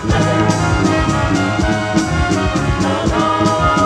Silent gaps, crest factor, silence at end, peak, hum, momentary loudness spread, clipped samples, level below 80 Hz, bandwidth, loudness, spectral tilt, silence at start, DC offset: none; 12 dB; 0 s; -2 dBFS; none; 3 LU; under 0.1%; -26 dBFS; 12 kHz; -15 LUFS; -5.5 dB/octave; 0 s; under 0.1%